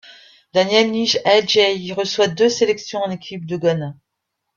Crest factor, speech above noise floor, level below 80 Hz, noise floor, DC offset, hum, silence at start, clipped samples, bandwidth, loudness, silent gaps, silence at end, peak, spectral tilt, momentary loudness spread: 16 dB; 59 dB; -62 dBFS; -77 dBFS; under 0.1%; none; 0.1 s; under 0.1%; 7.4 kHz; -18 LUFS; none; 0.65 s; -2 dBFS; -4 dB/octave; 11 LU